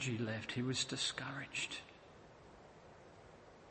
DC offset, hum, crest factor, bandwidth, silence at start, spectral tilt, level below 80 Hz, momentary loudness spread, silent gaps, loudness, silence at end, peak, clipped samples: under 0.1%; none; 20 dB; 8.8 kHz; 0 s; -3.5 dB/octave; -72 dBFS; 22 LU; none; -40 LUFS; 0 s; -24 dBFS; under 0.1%